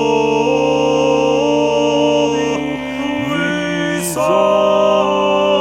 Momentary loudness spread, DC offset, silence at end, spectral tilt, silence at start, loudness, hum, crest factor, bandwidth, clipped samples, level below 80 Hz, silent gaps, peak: 6 LU; under 0.1%; 0 s; -4.5 dB/octave; 0 s; -15 LUFS; none; 12 dB; 16.5 kHz; under 0.1%; -46 dBFS; none; -2 dBFS